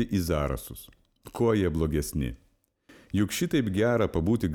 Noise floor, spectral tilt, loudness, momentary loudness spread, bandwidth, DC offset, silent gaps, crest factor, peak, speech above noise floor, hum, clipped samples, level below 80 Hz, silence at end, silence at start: -60 dBFS; -6 dB/octave; -27 LUFS; 11 LU; over 20 kHz; under 0.1%; none; 16 dB; -12 dBFS; 33 dB; none; under 0.1%; -42 dBFS; 0 s; 0 s